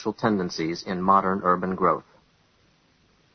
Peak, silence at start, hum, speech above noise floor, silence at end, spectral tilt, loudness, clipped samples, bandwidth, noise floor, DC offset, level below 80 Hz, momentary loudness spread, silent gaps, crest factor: -4 dBFS; 0 s; none; 39 dB; 1.35 s; -6.5 dB/octave; -24 LUFS; under 0.1%; 6.6 kHz; -62 dBFS; under 0.1%; -58 dBFS; 8 LU; none; 20 dB